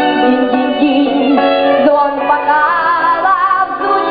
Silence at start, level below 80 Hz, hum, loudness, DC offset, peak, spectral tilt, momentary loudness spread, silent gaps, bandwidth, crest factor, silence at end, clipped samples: 0 s; -50 dBFS; none; -11 LUFS; under 0.1%; 0 dBFS; -8 dB/octave; 3 LU; none; 5 kHz; 12 dB; 0 s; under 0.1%